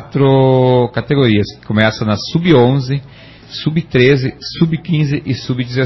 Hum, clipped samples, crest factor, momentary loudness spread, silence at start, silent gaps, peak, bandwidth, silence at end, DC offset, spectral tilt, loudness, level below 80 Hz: none; under 0.1%; 14 dB; 9 LU; 0 s; none; 0 dBFS; 6.2 kHz; 0 s; under 0.1%; -7.5 dB/octave; -14 LUFS; -42 dBFS